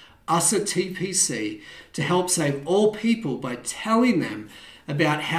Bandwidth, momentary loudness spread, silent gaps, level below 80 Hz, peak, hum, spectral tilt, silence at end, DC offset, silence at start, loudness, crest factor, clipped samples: 15.5 kHz; 12 LU; none; -60 dBFS; -6 dBFS; none; -3.5 dB/octave; 0 s; under 0.1%; 0.3 s; -23 LUFS; 16 dB; under 0.1%